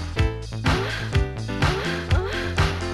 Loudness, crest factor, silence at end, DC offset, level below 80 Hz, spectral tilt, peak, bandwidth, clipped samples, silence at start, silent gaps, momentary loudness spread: -24 LUFS; 14 dB; 0 s; under 0.1%; -30 dBFS; -5.5 dB/octave; -10 dBFS; 13 kHz; under 0.1%; 0 s; none; 3 LU